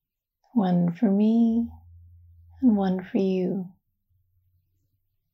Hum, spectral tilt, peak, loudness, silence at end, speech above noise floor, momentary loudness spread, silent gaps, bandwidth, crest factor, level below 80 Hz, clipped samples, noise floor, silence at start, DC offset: none; -10 dB/octave; -10 dBFS; -24 LUFS; 1.65 s; 51 dB; 10 LU; none; 6 kHz; 16 dB; -62 dBFS; under 0.1%; -74 dBFS; 0.55 s; under 0.1%